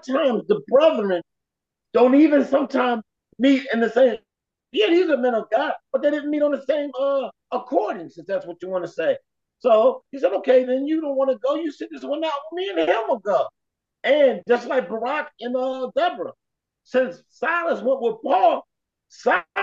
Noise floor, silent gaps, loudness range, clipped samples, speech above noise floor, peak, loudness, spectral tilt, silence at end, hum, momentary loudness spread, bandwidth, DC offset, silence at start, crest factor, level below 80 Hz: -84 dBFS; none; 5 LU; under 0.1%; 64 dB; -6 dBFS; -21 LUFS; -5.5 dB/octave; 0 s; none; 11 LU; 7.4 kHz; under 0.1%; 0.05 s; 16 dB; -74 dBFS